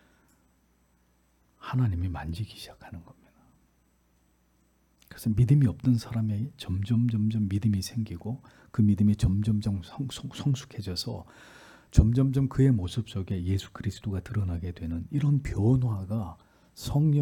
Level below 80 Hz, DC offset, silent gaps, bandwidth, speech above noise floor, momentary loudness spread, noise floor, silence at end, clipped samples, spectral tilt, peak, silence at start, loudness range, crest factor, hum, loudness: -42 dBFS; under 0.1%; none; 15 kHz; 40 dB; 14 LU; -67 dBFS; 0 s; under 0.1%; -7.5 dB/octave; -4 dBFS; 1.65 s; 8 LU; 24 dB; none; -28 LUFS